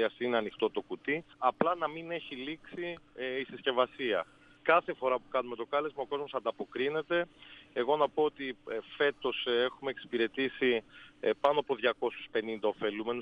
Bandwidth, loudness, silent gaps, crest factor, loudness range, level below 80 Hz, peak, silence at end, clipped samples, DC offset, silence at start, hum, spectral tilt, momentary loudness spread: 6 kHz; -33 LUFS; none; 22 dB; 3 LU; -72 dBFS; -12 dBFS; 0 s; under 0.1%; under 0.1%; 0 s; none; -6 dB/octave; 11 LU